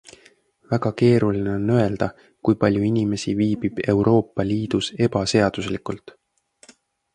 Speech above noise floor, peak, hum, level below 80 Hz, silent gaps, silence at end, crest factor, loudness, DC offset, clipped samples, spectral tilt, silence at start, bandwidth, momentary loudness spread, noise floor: 37 dB; -2 dBFS; none; -48 dBFS; none; 1.05 s; 18 dB; -21 LUFS; under 0.1%; under 0.1%; -6.5 dB/octave; 0.7 s; 10.5 kHz; 10 LU; -57 dBFS